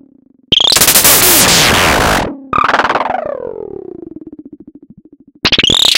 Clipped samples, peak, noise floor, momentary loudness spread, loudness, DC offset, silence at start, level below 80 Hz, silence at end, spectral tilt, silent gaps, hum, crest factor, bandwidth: 0.3%; 0 dBFS; -46 dBFS; 21 LU; -8 LUFS; under 0.1%; 0.5 s; -32 dBFS; 0 s; -1 dB/octave; none; none; 12 dB; over 20 kHz